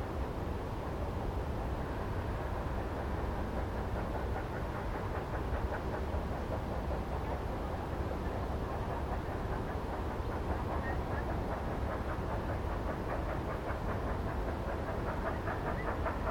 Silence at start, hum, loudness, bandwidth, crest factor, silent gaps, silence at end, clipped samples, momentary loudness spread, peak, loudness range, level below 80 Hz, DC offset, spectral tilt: 0 s; none; -38 LUFS; 17.5 kHz; 14 dB; none; 0 s; under 0.1%; 2 LU; -22 dBFS; 1 LU; -40 dBFS; under 0.1%; -7.5 dB/octave